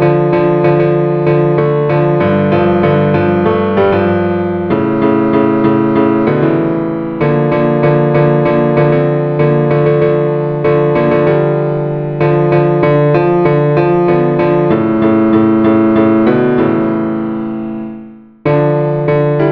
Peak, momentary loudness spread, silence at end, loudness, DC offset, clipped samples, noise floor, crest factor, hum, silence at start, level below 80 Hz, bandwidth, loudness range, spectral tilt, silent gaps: 0 dBFS; 5 LU; 0 s; -11 LUFS; under 0.1%; under 0.1%; -32 dBFS; 10 dB; none; 0 s; -44 dBFS; 5 kHz; 2 LU; -11 dB/octave; none